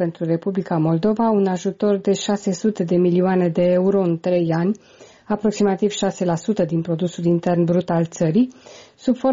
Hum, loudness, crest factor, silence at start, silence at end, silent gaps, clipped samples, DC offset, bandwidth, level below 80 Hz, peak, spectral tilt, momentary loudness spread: none; -20 LUFS; 12 dB; 0 s; 0 s; none; under 0.1%; under 0.1%; 7.6 kHz; -58 dBFS; -8 dBFS; -7 dB/octave; 5 LU